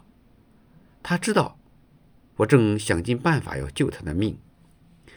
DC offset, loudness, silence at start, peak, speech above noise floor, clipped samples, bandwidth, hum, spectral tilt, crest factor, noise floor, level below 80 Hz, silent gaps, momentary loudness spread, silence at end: under 0.1%; -24 LUFS; 1.05 s; -2 dBFS; 34 dB; under 0.1%; over 20 kHz; none; -6 dB/octave; 24 dB; -56 dBFS; -48 dBFS; none; 12 LU; 0.8 s